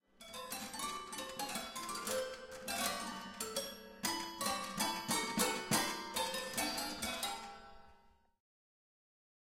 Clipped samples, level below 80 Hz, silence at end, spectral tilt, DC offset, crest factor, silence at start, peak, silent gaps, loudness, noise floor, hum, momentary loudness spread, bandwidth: under 0.1%; -68 dBFS; 1.3 s; -2 dB/octave; under 0.1%; 24 dB; 0.2 s; -18 dBFS; none; -39 LUFS; -67 dBFS; none; 11 LU; 16.5 kHz